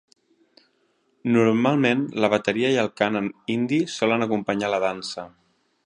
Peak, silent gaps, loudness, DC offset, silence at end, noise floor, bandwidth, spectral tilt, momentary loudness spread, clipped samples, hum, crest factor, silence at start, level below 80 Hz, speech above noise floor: -2 dBFS; none; -23 LUFS; under 0.1%; 0.55 s; -67 dBFS; 10.5 kHz; -5.5 dB/octave; 11 LU; under 0.1%; none; 20 dB; 1.25 s; -66 dBFS; 45 dB